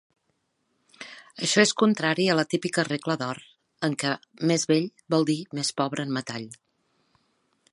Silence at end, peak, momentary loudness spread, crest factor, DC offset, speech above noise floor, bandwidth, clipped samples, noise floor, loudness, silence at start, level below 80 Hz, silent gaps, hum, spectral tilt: 1.15 s; -6 dBFS; 17 LU; 22 dB; under 0.1%; 49 dB; 11.5 kHz; under 0.1%; -74 dBFS; -25 LUFS; 1 s; -74 dBFS; none; none; -4 dB/octave